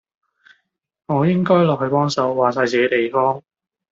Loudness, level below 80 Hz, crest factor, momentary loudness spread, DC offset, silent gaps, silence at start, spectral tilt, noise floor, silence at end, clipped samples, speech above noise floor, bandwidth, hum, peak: -18 LUFS; -62 dBFS; 16 dB; 5 LU; under 0.1%; none; 1.1 s; -6.5 dB/octave; -66 dBFS; 0.5 s; under 0.1%; 49 dB; 7.8 kHz; none; -2 dBFS